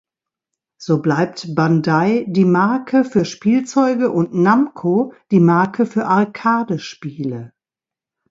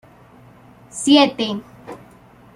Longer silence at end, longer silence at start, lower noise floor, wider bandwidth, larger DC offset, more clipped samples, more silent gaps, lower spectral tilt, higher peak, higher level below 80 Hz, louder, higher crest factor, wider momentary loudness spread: first, 0.85 s vs 0.6 s; second, 0.8 s vs 0.95 s; first, -89 dBFS vs -47 dBFS; second, 7.8 kHz vs 11.5 kHz; neither; neither; neither; first, -7.5 dB/octave vs -3.5 dB/octave; about the same, 0 dBFS vs -2 dBFS; about the same, -60 dBFS vs -60 dBFS; about the same, -17 LUFS vs -16 LUFS; about the same, 16 dB vs 20 dB; second, 11 LU vs 25 LU